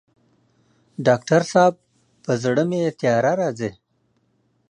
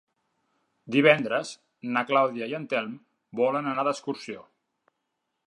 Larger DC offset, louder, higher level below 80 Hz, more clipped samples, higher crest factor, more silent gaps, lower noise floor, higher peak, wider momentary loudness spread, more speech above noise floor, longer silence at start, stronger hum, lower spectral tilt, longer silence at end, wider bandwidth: neither; first, -20 LUFS vs -26 LUFS; first, -64 dBFS vs -80 dBFS; neither; second, 18 dB vs 24 dB; neither; second, -67 dBFS vs -80 dBFS; about the same, -4 dBFS vs -4 dBFS; second, 13 LU vs 20 LU; second, 48 dB vs 55 dB; first, 1 s vs 0.85 s; neither; about the same, -6 dB/octave vs -5 dB/octave; about the same, 1 s vs 1.05 s; about the same, 10.5 kHz vs 11 kHz